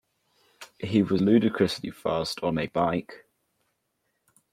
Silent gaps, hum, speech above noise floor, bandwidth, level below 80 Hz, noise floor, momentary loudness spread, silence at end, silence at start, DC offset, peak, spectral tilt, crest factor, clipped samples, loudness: none; none; 52 dB; 15 kHz; -60 dBFS; -77 dBFS; 9 LU; 1.35 s; 0.6 s; under 0.1%; -8 dBFS; -6.5 dB/octave; 20 dB; under 0.1%; -26 LUFS